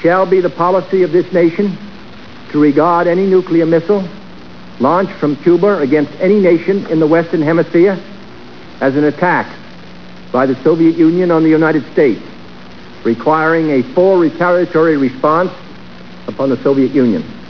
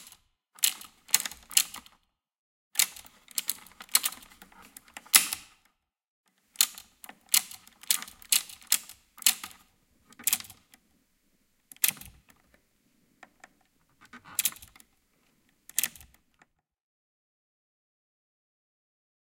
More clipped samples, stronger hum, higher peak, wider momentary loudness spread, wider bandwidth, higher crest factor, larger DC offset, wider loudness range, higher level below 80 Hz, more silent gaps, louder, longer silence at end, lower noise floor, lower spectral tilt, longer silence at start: neither; neither; about the same, 0 dBFS vs 0 dBFS; second, 9 LU vs 22 LU; second, 5.4 kHz vs 17 kHz; second, 12 dB vs 34 dB; first, 2% vs under 0.1%; second, 2 LU vs 10 LU; first, -50 dBFS vs -70 dBFS; second, none vs 2.38-2.71 s, 6.10-6.24 s; first, -12 LUFS vs -27 LUFS; second, 0 s vs 3.5 s; second, -34 dBFS vs -73 dBFS; first, -8.5 dB/octave vs 2.5 dB/octave; second, 0 s vs 0.6 s